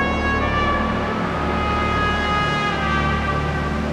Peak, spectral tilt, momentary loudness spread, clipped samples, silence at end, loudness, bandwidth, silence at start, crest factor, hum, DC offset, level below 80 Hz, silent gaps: -6 dBFS; -6 dB/octave; 3 LU; under 0.1%; 0 s; -20 LUFS; 10.5 kHz; 0 s; 14 dB; none; under 0.1%; -28 dBFS; none